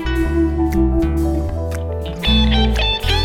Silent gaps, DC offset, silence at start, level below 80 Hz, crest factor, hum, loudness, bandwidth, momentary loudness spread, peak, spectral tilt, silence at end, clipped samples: none; under 0.1%; 0 s; -20 dBFS; 12 dB; none; -18 LUFS; 15.5 kHz; 9 LU; -4 dBFS; -6 dB/octave; 0 s; under 0.1%